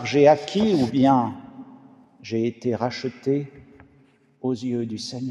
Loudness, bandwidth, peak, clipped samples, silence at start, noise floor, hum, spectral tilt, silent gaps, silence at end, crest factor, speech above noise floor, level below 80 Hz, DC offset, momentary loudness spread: -23 LUFS; 10.5 kHz; -4 dBFS; under 0.1%; 0 s; -58 dBFS; none; -6.5 dB/octave; none; 0 s; 20 dB; 36 dB; -62 dBFS; under 0.1%; 22 LU